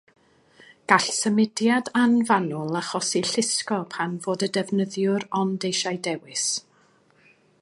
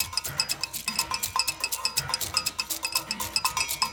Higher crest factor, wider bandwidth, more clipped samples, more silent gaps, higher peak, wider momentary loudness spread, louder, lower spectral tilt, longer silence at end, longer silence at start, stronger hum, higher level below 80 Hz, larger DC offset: about the same, 22 dB vs 22 dB; second, 11.5 kHz vs over 20 kHz; neither; neither; first, -2 dBFS vs -8 dBFS; first, 8 LU vs 2 LU; first, -24 LUFS vs -27 LUFS; first, -3.5 dB/octave vs 0 dB/octave; first, 1 s vs 0 s; first, 0.9 s vs 0 s; neither; second, -72 dBFS vs -54 dBFS; neither